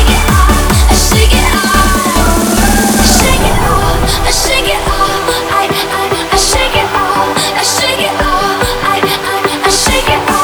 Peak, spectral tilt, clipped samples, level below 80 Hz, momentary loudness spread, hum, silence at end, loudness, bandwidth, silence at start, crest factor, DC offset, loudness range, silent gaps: 0 dBFS; -3.5 dB/octave; 0.2%; -16 dBFS; 4 LU; none; 0 s; -10 LUFS; over 20 kHz; 0 s; 10 dB; under 0.1%; 2 LU; none